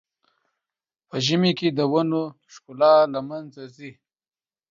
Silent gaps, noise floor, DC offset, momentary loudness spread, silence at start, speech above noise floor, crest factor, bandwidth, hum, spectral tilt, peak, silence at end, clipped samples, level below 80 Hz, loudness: none; -89 dBFS; under 0.1%; 24 LU; 1.15 s; 67 dB; 18 dB; 7.6 kHz; none; -6 dB/octave; -6 dBFS; 0.8 s; under 0.1%; -70 dBFS; -21 LUFS